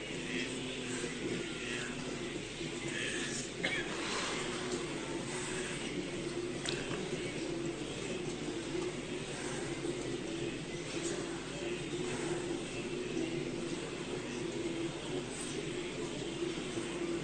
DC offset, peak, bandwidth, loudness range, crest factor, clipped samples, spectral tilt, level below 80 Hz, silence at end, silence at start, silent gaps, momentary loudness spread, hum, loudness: under 0.1%; -16 dBFS; 9.4 kHz; 2 LU; 22 dB; under 0.1%; -4 dB/octave; -58 dBFS; 0 s; 0 s; none; 4 LU; none; -38 LUFS